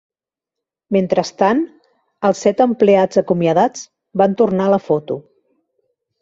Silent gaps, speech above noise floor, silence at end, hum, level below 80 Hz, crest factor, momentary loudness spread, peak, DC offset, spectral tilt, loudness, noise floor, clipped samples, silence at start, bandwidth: none; 70 dB; 1 s; none; -60 dBFS; 16 dB; 11 LU; -2 dBFS; under 0.1%; -6.5 dB/octave; -16 LUFS; -85 dBFS; under 0.1%; 0.9 s; 7.8 kHz